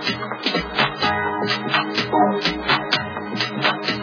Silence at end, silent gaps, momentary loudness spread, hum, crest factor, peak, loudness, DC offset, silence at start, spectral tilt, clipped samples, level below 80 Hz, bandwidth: 0 s; none; 5 LU; none; 18 dB; -4 dBFS; -20 LUFS; under 0.1%; 0 s; -4.5 dB/octave; under 0.1%; -48 dBFS; 5.4 kHz